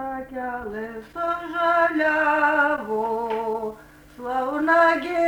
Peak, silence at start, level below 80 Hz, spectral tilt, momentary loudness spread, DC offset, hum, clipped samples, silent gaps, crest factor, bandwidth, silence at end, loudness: -6 dBFS; 0 s; -56 dBFS; -5 dB/octave; 14 LU; under 0.1%; none; under 0.1%; none; 16 dB; over 20 kHz; 0 s; -22 LUFS